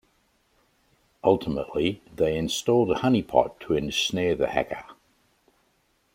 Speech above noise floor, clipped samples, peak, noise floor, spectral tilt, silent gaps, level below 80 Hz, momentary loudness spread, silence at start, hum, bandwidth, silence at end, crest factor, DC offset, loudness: 44 dB; under 0.1%; -6 dBFS; -68 dBFS; -5 dB/octave; none; -52 dBFS; 7 LU; 1.25 s; none; 16.5 kHz; 1.2 s; 22 dB; under 0.1%; -25 LUFS